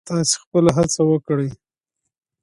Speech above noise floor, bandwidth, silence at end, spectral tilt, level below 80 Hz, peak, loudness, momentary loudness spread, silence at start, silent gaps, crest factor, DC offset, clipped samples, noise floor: 62 dB; 11.5 kHz; 0.85 s; -5 dB/octave; -50 dBFS; -2 dBFS; -19 LUFS; 7 LU; 0.05 s; 0.46-0.52 s; 18 dB; under 0.1%; under 0.1%; -80 dBFS